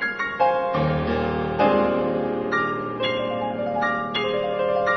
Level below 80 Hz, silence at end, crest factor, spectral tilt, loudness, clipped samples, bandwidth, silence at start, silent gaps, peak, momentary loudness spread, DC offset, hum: -46 dBFS; 0 s; 16 dB; -7 dB/octave; -23 LUFS; under 0.1%; 6.2 kHz; 0 s; none; -8 dBFS; 5 LU; under 0.1%; none